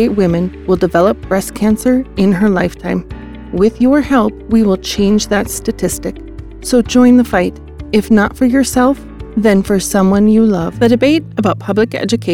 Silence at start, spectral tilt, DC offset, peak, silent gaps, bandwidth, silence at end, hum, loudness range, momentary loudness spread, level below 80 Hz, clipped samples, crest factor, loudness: 0 s; -5.5 dB/octave; 0.4%; 0 dBFS; none; 16.5 kHz; 0 s; none; 2 LU; 10 LU; -32 dBFS; under 0.1%; 12 dB; -13 LUFS